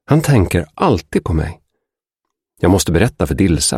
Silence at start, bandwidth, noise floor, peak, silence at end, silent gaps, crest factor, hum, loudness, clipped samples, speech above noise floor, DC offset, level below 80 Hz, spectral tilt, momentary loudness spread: 0.1 s; 16 kHz; -79 dBFS; 0 dBFS; 0 s; none; 14 dB; none; -15 LUFS; under 0.1%; 65 dB; under 0.1%; -30 dBFS; -5.5 dB/octave; 6 LU